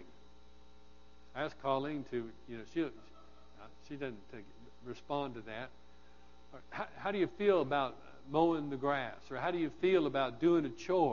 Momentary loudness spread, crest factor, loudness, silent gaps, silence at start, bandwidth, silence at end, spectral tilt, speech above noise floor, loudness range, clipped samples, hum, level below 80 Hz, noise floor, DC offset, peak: 18 LU; 20 dB; -36 LUFS; none; 0 s; 7 kHz; 0 s; -4.5 dB/octave; 27 dB; 12 LU; under 0.1%; none; -64 dBFS; -62 dBFS; 0.2%; -16 dBFS